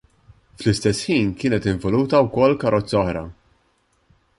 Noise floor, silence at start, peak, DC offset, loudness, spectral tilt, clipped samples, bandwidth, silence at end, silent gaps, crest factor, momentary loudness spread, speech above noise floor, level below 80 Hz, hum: -64 dBFS; 0.6 s; -4 dBFS; under 0.1%; -20 LUFS; -6 dB/octave; under 0.1%; 11.5 kHz; 1.05 s; none; 18 dB; 8 LU; 45 dB; -44 dBFS; none